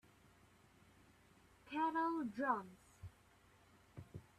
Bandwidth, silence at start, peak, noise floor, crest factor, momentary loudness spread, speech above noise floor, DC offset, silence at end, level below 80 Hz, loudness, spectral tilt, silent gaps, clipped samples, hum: 14 kHz; 1.65 s; -24 dBFS; -69 dBFS; 22 dB; 22 LU; 29 dB; under 0.1%; 0.15 s; -74 dBFS; -41 LUFS; -6.5 dB/octave; none; under 0.1%; none